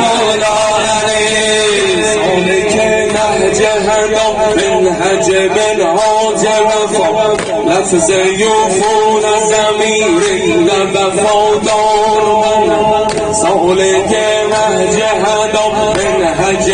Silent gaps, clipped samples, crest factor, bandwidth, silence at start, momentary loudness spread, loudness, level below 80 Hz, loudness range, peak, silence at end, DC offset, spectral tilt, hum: none; under 0.1%; 10 dB; 10 kHz; 0 s; 2 LU; -11 LUFS; -38 dBFS; 1 LU; 0 dBFS; 0 s; under 0.1%; -3 dB/octave; none